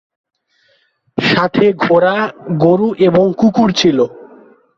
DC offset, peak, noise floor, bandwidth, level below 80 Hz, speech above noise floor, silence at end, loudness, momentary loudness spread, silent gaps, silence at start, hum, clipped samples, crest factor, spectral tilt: under 0.1%; 0 dBFS; -58 dBFS; 7.6 kHz; -50 dBFS; 46 dB; 0.55 s; -13 LUFS; 7 LU; none; 1.15 s; none; under 0.1%; 14 dB; -6 dB/octave